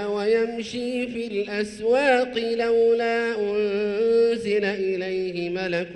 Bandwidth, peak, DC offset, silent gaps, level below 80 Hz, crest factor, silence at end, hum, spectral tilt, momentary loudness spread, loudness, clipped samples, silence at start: 11 kHz; -8 dBFS; under 0.1%; none; -60 dBFS; 14 dB; 0 s; none; -5 dB/octave; 8 LU; -23 LUFS; under 0.1%; 0 s